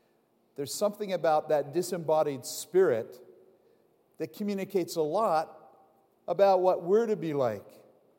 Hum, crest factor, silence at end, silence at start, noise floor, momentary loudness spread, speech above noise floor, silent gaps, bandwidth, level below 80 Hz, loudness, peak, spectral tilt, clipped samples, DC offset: none; 18 dB; 0.5 s; 0.6 s; -69 dBFS; 15 LU; 41 dB; none; 16.5 kHz; -88 dBFS; -28 LUFS; -12 dBFS; -5 dB/octave; under 0.1%; under 0.1%